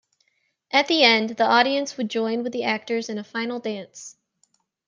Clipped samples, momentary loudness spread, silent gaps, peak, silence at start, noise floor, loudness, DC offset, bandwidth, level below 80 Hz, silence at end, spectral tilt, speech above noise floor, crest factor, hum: under 0.1%; 16 LU; none; -2 dBFS; 0.75 s; -70 dBFS; -22 LUFS; under 0.1%; 9.8 kHz; -78 dBFS; 0.75 s; -3 dB/octave; 48 dB; 22 dB; none